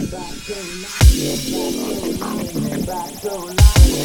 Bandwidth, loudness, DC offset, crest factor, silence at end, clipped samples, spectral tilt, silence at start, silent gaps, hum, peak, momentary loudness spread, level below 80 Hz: 18.5 kHz; -19 LUFS; under 0.1%; 16 dB; 0 s; under 0.1%; -5 dB/octave; 0 s; none; none; 0 dBFS; 14 LU; -18 dBFS